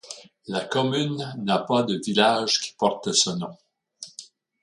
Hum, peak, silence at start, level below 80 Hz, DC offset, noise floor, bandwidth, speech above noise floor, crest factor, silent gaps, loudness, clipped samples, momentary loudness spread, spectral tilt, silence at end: none; -4 dBFS; 0.05 s; -68 dBFS; under 0.1%; -47 dBFS; 11.5 kHz; 24 dB; 22 dB; none; -23 LUFS; under 0.1%; 19 LU; -3.5 dB/octave; 0.35 s